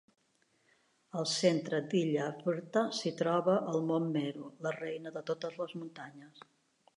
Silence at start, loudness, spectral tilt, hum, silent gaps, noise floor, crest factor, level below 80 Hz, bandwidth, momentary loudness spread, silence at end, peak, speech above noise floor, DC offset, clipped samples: 1.15 s; -34 LUFS; -5 dB/octave; none; none; -74 dBFS; 20 dB; -86 dBFS; 11.5 kHz; 13 LU; 0.55 s; -14 dBFS; 40 dB; under 0.1%; under 0.1%